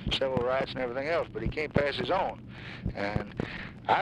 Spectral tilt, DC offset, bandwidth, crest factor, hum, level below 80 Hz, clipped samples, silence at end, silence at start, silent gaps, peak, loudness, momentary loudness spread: -6 dB/octave; under 0.1%; 11 kHz; 22 dB; none; -46 dBFS; under 0.1%; 0 s; 0 s; none; -8 dBFS; -31 LUFS; 9 LU